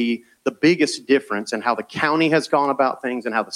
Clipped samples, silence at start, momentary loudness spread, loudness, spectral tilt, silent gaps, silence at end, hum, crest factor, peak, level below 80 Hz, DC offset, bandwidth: under 0.1%; 0 s; 8 LU; -20 LUFS; -4.5 dB/octave; none; 0 s; none; 16 dB; -4 dBFS; -68 dBFS; under 0.1%; 12 kHz